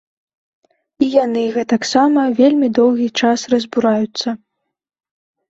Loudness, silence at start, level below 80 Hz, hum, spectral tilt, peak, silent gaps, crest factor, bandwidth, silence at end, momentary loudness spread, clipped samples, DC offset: -15 LUFS; 1 s; -60 dBFS; none; -4.5 dB/octave; -2 dBFS; none; 14 dB; 8 kHz; 1.15 s; 7 LU; under 0.1%; under 0.1%